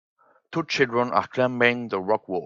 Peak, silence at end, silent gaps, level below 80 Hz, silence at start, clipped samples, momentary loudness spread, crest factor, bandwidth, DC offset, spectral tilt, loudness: -4 dBFS; 0 s; none; -70 dBFS; 0.5 s; under 0.1%; 8 LU; 22 dB; 7.6 kHz; under 0.1%; -5 dB/octave; -23 LUFS